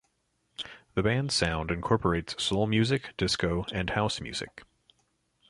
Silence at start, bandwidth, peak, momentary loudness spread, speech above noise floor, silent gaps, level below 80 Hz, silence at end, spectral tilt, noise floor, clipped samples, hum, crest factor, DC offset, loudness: 0.6 s; 11.5 kHz; -10 dBFS; 13 LU; 46 dB; none; -46 dBFS; 0.9 s; -5 dB/octave; -75 dBFS; under 0.1%; none; 20 dB; under 0.1%; -29 LUFS